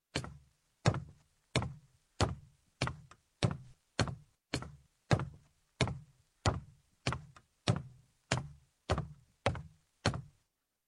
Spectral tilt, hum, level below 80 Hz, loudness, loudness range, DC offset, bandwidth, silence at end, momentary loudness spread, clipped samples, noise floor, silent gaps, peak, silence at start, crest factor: -5 dB/octave; none; -52 dBFS; -38 LUFS; 1 LU; under 0.1%; 12 kHz; 0.6 s; 16 LU; under 0.1%; -81 dBFS; none; -10 dBFS; 0.15 s; 28 dB